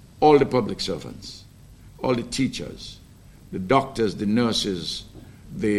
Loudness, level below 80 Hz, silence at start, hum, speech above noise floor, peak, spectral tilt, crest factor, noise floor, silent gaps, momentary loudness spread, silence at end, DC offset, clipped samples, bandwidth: -23 LUFS; -48 dBFS; 0.15 s; none; 25 dB; -4 dBFS; -5.5 dB/octave; 20 dB; -48 dBFS; none; 21 LU; 0 s; under 0.1%; under 0.1%; 13.5 kHz